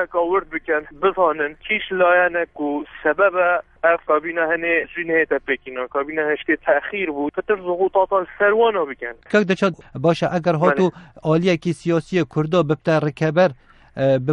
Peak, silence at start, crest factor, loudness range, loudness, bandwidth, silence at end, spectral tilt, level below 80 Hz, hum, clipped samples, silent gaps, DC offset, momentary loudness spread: -2 dBFS; 0 s; 18 dB; 2 LU; -20 LUFS; 10.5 kHz; 0 s; -7 dB/octave; -52 dBFS; none; under 0.1%; none; under 0.1%; 7 LU